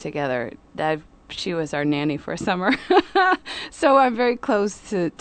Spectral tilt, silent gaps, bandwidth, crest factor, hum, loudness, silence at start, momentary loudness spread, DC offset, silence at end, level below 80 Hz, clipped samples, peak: -5 dB/octave; none; 9.2 kHz; 18 dB; none; -22 LUFS; 0 s; 12 LU; under 0.1%; 0.1 s; -54 dBFS; under 0.1%; -4 dBFS